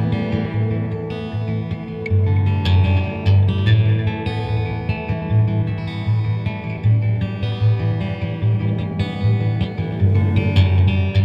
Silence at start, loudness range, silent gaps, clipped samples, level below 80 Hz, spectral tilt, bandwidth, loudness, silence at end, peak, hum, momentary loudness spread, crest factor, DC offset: 0 s; 3 LU; none; under 0.1%; -38 dBFS; -9 dB/octave; 5.6 kHz; -19 LUFS; 0 s; -4 dBFS; none; 8 LU; 14 dB; under 0.1%